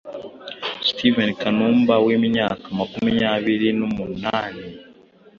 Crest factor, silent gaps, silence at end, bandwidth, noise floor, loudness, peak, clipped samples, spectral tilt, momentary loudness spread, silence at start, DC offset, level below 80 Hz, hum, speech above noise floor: 18 dB; none; 0.55 s; 6.8 kHz; -49 dBFS; -20 LUFS; -4 dBFS; under 0.1%; -6.5 dB/octave; 16 LU; 0.05 s; under 0.1%; -54 dBFS; none; 30 dB